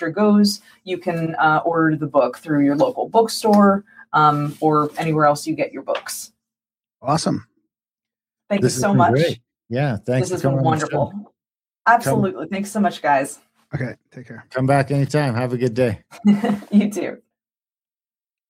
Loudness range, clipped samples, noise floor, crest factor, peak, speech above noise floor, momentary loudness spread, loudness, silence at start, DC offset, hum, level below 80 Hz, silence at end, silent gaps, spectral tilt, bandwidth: 5 LU; under 0.1%; under -90 dBFS; 16 dB; -2 dBFS; over 71 dB; 13 LU; -19 LUFS; 0 s; under 0.1%; none; -58 dBFS; 1.35 s; none; -6 dB/octave; 16 kHz